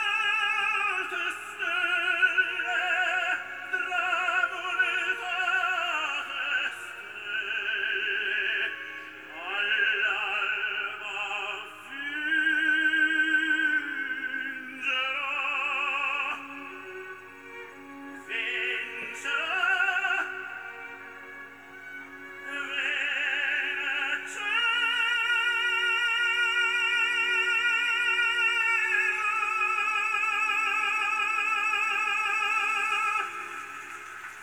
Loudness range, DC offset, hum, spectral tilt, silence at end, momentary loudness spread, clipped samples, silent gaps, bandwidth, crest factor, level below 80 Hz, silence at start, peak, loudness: 7 LU; under 0.1%; none; 0 dB/octave; 0 s; 16 LU; under 0.1%; none; over 20 kHz; 18 dB; -80 dBFS; 0 s; -12 dBFS; -26 LUFS